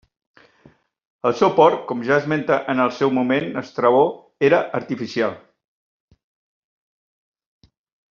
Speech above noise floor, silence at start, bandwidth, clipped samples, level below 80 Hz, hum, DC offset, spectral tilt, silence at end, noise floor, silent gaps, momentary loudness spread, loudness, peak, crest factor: 36 dB; 1.25 s; 7.2 kHz; under 0.1%; -66 dBFS; none; under 0.1%; -4.5 dB/octave; 2.75 s; -54 dBFS; none; 9 LU; -19 LUFS; -2 dBFS; 20 dB